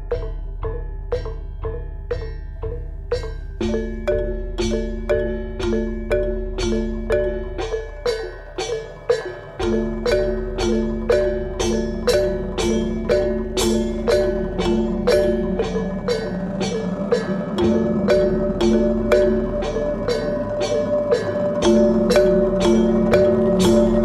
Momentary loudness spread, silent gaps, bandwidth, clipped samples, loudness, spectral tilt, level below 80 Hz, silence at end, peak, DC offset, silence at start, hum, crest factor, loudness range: 13 LU; none; 14 kHz; under 0.1%; -21 LUFS; -6 dB/octave; -30 dBFS; 0 s; -2 dBFS; under 0.1%; 0 s; none; 18 dB; 8 LU